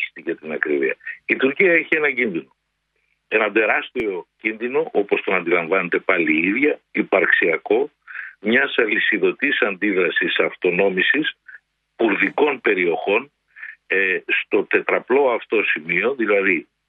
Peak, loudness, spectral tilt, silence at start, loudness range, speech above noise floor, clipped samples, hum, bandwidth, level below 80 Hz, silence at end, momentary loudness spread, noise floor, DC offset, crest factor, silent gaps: -2 dBFS; -19 LUFS; -7.5 dB/octave; 0 s; 2 LU; 52 dB; under 0.1%; none; 4.3 kHz; -68 dBFS; 0.25 s; 9 LU; -71 dBFS; under 0.1%; 18 dB; none